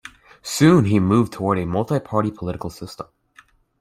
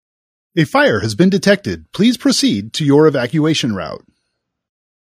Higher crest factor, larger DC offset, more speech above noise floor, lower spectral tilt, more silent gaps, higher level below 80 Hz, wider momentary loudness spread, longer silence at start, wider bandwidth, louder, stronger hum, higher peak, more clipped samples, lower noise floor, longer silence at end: about the same, 18 dB vs 16 dB; neither; second, 34 dB vs 59 dB; first, -6.5 dB/octave vs -5 dB/octave; neither; about the same, -50 dBFS vs -52 dBFS; first, 20 LU vs 12 LU; second, 0.05 s vs 0.55 s; about the same, 16 kHz vs 15.5 kHz; second, -19 LUFS vs -15 LUFS; neither; about the same, -2 dBFS vs 0 dBFS; neither; second, -53 dBFS vs -73 dBFS; second, 0.75 s vs 1.2 s